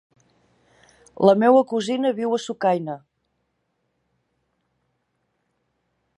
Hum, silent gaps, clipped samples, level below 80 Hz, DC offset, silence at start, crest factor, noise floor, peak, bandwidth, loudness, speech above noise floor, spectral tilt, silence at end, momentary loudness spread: none; none; under 0.1%; -70 dBFS; under 0.1%; 1.2 s; 22 dB; -73 dBFS; -2 dBFS; 10.5 kHz; -20 LUFS; 54 dB; -6 dB/octave; 3.2 s; 10 LU